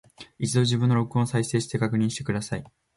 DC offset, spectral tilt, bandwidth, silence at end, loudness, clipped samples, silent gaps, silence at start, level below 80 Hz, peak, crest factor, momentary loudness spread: under 0.1%; -5.5 dB/octave; 11.5 kHz; 0.3 s; -25 LUFS; under 0.1%; none; 0.2 s; -56 dBFS; -10 dBFS; 16 dB; 9 LU